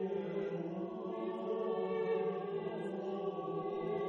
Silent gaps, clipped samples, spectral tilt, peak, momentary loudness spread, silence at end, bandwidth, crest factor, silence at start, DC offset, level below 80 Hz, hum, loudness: none; under 0.1%; -8.5 dB/octave; -26 dBFS; 5 LU; 0 s; 6.2 kHz; 12 dB; 0 s; under 0.1%; -80 dBFS; none; -39 LUFS